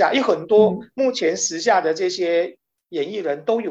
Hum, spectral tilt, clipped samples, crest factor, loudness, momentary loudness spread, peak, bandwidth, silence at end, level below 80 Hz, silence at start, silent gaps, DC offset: none; -3.5 dB/octave; under 0.1%; 16 dB; -20 LUFS; 10 LU; -4 dBFS; 8.2 kHz; 0 s; -66 dBFS; 0 s; none; under 0.1%